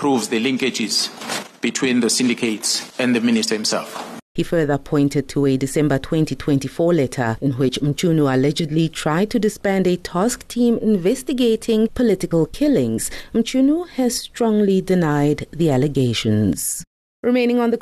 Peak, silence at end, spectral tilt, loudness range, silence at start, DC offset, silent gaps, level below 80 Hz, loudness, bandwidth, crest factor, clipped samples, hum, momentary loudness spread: -8 dBFS; 0 s; -5 dB/octave; 1 LU; 0 s; under 0.1%; 4.22-4.35 s, 16.87-17.23 s; -44 dBFS; -19 LUFS; 13.5 kHz; 12 dB; under 0.1%; none; 5 LU